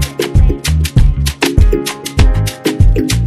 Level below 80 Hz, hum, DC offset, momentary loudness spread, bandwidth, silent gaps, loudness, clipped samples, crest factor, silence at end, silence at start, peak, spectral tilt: -14 dBFS; none; under 0.1%; 4 LU; 14.5 kHz; none; -13 LUFS; 1%; 10 dB; 0 s; 0 s; 0 dBFS; -5.5 dB/octave